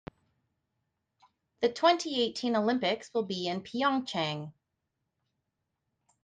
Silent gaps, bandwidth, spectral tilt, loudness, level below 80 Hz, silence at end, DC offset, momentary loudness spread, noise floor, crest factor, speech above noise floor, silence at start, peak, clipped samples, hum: none; 9.6 kHz; -4.5 dB/octave; -30 LUFS; -72 dBFS; 1.7 s; under 0.1%; 8 LU; -83 dBFS; 22 dB; 54 dB; 1.6 s; -12 dBFS; under 0.1%; none